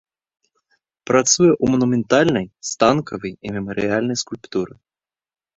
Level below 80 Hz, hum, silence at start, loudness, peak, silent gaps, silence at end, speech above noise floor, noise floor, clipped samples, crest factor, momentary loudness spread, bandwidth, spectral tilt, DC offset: -52 dBFS; none; 1.1 s; -19 LUFS; 0 dBFS; none; 0.9 s; 49 dB; -68 dBFS; under 0.1%; 20 dB; 13 LU; 8 kHz; -4 dB/octave; under 0.1%